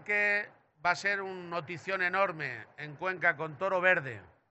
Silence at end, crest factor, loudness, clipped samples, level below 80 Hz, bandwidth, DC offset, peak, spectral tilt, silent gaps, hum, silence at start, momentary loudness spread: 0.25 s; 20 dB; -31 LUFS; under 0.1%; -78 dBFS; 8 kHz; under 0.1%; -12 dBFS; -2 dB/octave; none; none; 0 s; 14 LU